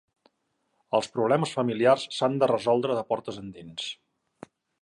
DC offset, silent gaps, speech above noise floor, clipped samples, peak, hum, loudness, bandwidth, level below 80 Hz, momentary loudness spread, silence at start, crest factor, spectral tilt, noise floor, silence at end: under 0.1%; none; 50 dB; under 0.1%; -8 dBFS; none; -26 LUFS; 11.5 kHz; -70 dBFS; 15 LU; 0.9 s; 20 dB; -5.5 dB/octave; -75 dBFS; 0.9 s